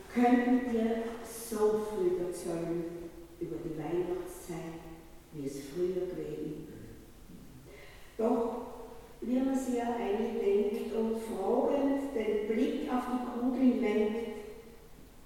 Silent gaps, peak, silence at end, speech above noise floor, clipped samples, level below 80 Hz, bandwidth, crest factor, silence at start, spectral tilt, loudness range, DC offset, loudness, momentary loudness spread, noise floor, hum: none; -14 dBFS; 0 s; 20 dB; under 0.1%; -56 dBFS; 16.5 kHz; 18 dB; 0 s; -6 dB/octave; 8 LU; under 0.1%; -33 LUFS; 20 LU; -52 dBFS; none